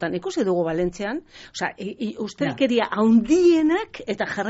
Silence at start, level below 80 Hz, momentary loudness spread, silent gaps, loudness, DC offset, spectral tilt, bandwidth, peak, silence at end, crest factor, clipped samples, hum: 0 s; -52 dBFS; 13 LU; none; -22 LUFS; under 0.1%; -4.5 dB/octave; 8 kHz; -8 dBFS; 0 s; 14 dB; under 0.1%; none